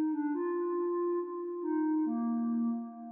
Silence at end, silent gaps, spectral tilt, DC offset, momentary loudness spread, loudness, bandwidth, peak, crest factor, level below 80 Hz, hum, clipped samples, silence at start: 0 s; none; -3.5 dB/octave; under 0.1%; 5 LU; -33 LUFS; 2.6 kHz; -24 dBFS; 8 dB; under -90 dBFS; none; under 0.1%; 0 s